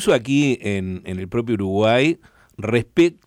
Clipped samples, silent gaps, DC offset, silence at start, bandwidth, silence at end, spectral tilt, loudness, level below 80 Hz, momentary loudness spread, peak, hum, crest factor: under 0.1%; none; under 0.1%; 0 s; 15.5 kHz; 0.15 s; -6 dB/octave; -20 LUFS; -52 dBFS; 12 LU; -6 dBFS; none; 14 dB